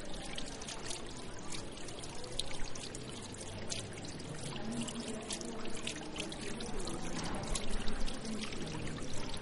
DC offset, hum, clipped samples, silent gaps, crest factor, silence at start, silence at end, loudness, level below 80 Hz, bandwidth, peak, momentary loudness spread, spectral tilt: under 0.1%; none; under 0.1%; none; 20 dB; 0 s; 0 s; -42 LUFS; -46 dBFS; 11.5 kHz; -18 dBFS; 5 LU; -3.5 dB/octave